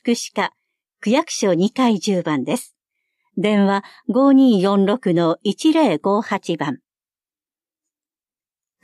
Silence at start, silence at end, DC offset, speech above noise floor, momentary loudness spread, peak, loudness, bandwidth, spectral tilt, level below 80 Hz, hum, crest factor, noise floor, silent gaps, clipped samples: 0.05 s; 2.05 s; under 0.1%; over 73 dB; 10 LU; -4 dBFS; -18 LUFS; 13 kHz; -5.5 dB/octave; -74 dBFS; none; 14 dB; under -90 dBFS; none; under 0.1%